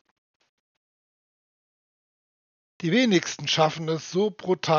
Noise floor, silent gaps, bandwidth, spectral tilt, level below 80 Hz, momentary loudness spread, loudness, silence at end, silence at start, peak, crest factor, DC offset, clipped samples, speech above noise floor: under -90 dBFS; none; 7.2 kHz; -3.5 dB/octave; -76 dBFS; 7 LU; -24 LUFS; 0 s; 2.8 s; -8 dBFS; 20 dB; under 0.1%; under 0.1%; over 67 dB